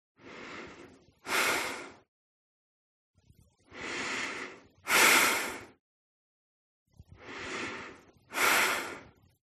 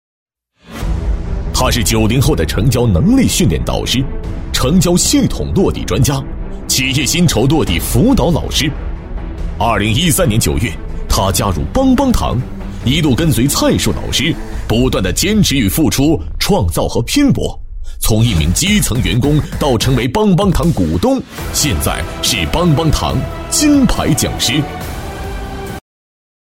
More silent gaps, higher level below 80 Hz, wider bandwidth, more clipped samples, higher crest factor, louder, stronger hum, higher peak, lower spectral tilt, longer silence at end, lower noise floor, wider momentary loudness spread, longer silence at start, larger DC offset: first, 2.08-3.14 s, 5.80-6.86 s vs none; second, -70 dBFS vs -22 dBFS; second, 13 kHz vs 16.5 kHz; neither; first, 24 dB vs 12 dB; second, -28 LUFS vs -13 LUFS; neither; second, -10 dBFS vs 0 dBFS; second, -0.5 dB/octave vs -4.5 dB/octave; second, 0.4 s vs 0.75 s; first, -64 dBFS vs -37 dBFS; first, 25 LU vs 12 LU; second, 0.25 s vs 0.7 s; neither